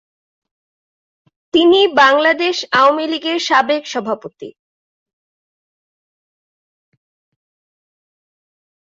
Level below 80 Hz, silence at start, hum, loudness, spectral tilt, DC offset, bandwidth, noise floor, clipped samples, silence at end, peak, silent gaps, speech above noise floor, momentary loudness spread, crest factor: -64 dBFS; 1.55 s; none; -14 LUFS; -3 dB/octave; under 0.1%; 7.8 kHz; under -90 dBFS; under 0.1%; 4.3 s; -2 dBFS; none; over 76 dB; 11 LU; 18 dB